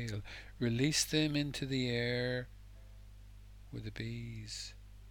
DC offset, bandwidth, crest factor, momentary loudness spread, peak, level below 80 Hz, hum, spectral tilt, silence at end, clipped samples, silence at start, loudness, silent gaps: under 0.1%; 19 kHz; 20 dB; 26 LU; -16 dBFS; -54 dBFS; 50 Hz at -55 dBFS; -4 dB/octave; 0 s; under 0.1%; 0 s; -36 LUFS; none